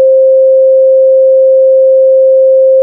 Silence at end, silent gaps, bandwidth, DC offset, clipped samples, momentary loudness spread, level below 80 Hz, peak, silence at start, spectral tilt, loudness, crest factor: 0 s; none; 0.6 kHz; under 0.1%; under 0.1%; 0 LU; under -90 dBFS; -2 dBFS; 0 s; -7.5 dB/octave; -6 LUFS; 4 dB